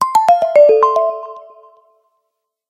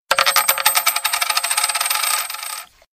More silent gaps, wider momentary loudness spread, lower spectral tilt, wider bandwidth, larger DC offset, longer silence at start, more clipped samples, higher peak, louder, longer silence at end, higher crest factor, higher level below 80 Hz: neither; first, 17 LU vs 12 LU; first, -3 dB/octave vs 3.5 dB/octave; second, 14.5 kHz vs 16 kHz; neither; about the same, 0 s vs 0.1 s; neither; about the same, 0 dBFS vs 0 dBFS; first, -11 LUFS vs -16 LUFS; first, 1.3 s vs 0.3 s; about the same, 14 dB vs 18 dB; about the same, -66 dBFS vs -62 dBFS